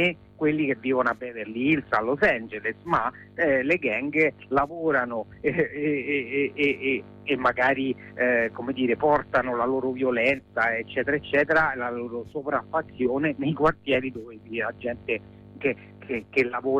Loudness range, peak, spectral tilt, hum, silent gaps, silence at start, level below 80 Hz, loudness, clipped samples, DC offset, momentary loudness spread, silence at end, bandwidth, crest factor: 3 LU; -10 dBFS; -7 dB/octave; none; none; 0 s; -56 dBFS; -25 LUFS; under 0.1%; under 0.1%; 9 LU; 0 s; 8.6 kHz; 16 dB